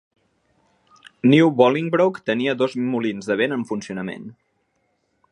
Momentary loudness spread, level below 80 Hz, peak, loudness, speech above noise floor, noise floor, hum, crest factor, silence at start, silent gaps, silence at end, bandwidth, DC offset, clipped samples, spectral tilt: 15 LU; -68 dBFS; -2 dBFS; -20 LUFS; 50 dB; -69 dBFS; none; 20 dB; 1.25 s; none; 1 s; 9.8 kHz; under 0.1%; under 0.1%; -6.5 dB/octave